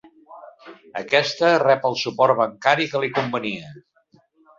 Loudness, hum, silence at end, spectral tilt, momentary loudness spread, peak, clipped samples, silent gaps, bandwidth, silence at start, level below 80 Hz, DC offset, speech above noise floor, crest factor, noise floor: -20 LUFS; none; 0.8 s; -4.5 dB/octave; 12 LU; -2 dBFS; under 0.1%; none; 7.6 kHz; 0.3 s; -68 dBFS; under 0.1%; 38 dB; 20 dB; -58 dBFS